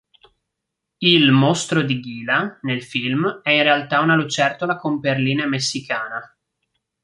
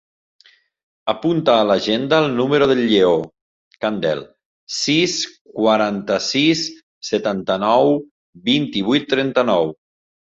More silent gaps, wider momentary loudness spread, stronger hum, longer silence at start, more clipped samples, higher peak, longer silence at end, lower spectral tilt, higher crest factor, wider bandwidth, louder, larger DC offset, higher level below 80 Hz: second, none vs 3.41-3.71 s, 4.45-4.67 s, 5.41-5.45 s, 6.83-7.01 s, 8.11-8.33 s; about the same, 10 LU vs 10 LU; neither; about the same, 1 s vs 1.05 s; neither; about the same, -2 dBFS vs -2 dBFS; first, 0.8 s vs 0.5 s; about the same, -4.5 dB/octave vs -4.5 dB/octave; about the same, 18 dB vs 18 dB; first, 11.5 kHz vs 7.8 kHz; about the same, -18 LUFS vs -18 LUFS; neither; second, -64 dBFS vs -58 dBFS